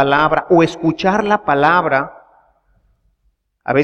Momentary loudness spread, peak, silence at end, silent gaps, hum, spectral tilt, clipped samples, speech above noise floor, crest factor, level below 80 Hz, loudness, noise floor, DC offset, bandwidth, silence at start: 6 LU; 0 dBFS; 0 s; none; none; -6.5 dB/octave; under 0.1%; 50 dB; 16 dB; -48 dBFS; -15 LUFS; -64 dBFS; under 0.1%; 8.8 kHz; 0 s